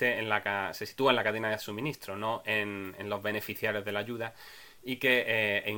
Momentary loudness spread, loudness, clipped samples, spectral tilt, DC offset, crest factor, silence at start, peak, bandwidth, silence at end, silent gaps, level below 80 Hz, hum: 12 LU; -31 LUFS; under 0.1%; -4.5 dB/octave; under 0.1%; 22 dB; 0 s; -10 dBFS; 17 kHz; 0 s; none; -70 dBFS; none